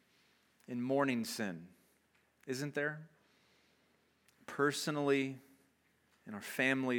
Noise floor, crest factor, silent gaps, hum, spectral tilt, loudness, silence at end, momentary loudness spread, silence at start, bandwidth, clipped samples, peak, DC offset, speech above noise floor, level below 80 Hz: -74 dBFS; 22 dB; none; none; -4.5 dB/octave; -37 LUFS; 0 s; 18 LU; 0.7 s; 18 kHz; under 0.1%; -18 dBFS; under 0.1%; 38 dB; -88 dBFS